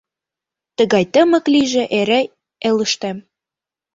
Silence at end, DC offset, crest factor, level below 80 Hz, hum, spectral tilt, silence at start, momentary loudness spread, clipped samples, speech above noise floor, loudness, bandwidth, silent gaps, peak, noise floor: 0.75 s; under 0.1%; 16 dB; -60 dBFS; none; -4 dB/octave; 0.8 s; 13 LU; under 0.1%; 72 dB; -16 LUFS; 8 kHz; none; -2 dBFS; -88 dBFS